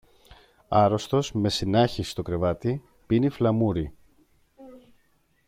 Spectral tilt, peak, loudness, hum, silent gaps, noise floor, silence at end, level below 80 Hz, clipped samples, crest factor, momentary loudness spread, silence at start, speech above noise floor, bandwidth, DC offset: -6.5 dB/octave; -8 dBFS; -25 LUFS; none; none; -66 dBFS; 0.7 s; -50 dBFS; under 0.1%; 18 dB; 9 LU; 0.7 s; 42 dB; 15.5 kHz; under 0.1%